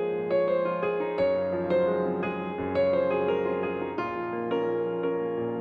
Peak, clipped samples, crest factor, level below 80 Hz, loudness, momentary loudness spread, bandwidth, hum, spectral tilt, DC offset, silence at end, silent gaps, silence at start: -14 dBFS; under 0.1%; 12 dB; -62 dBFS; -28 LUFS; 6 LU; 5 kHz; none; -9 dB/octave; under 0.1%; 0 s; none; 0 s